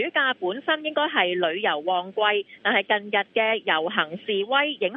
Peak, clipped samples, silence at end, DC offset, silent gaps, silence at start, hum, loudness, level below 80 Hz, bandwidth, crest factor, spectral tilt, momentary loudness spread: -6 dBFS; under 0.1%; 0 s; under 0.1%; none; 0 s; none; -23 LUFS; -82 dBFS; 4.5 kHz; 18 dB; -7 dB/octave; 4 LU